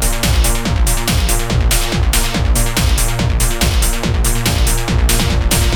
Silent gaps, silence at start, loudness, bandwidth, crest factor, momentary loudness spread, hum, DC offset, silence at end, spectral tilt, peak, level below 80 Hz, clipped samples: none; 0 s; -15 LUFS; 19.5 kHz; 12 dB; 2 LU; none; under 0.1%; 0 s; -3.5 dB/octave; 0 dBFS; -16 dBFS; under 0.1%